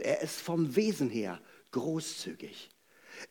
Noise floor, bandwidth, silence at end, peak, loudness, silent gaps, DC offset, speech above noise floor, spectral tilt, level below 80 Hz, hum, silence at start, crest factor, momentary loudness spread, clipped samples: -53 dBFS; 19 kHz; 0.05 s; -14 dBFS; -34 LUFS; none; under 0.1%; 20 dB; -5 dB/octave; -84 dBFS; none; 0 s; 20 dB; 19 LU; under 0.1%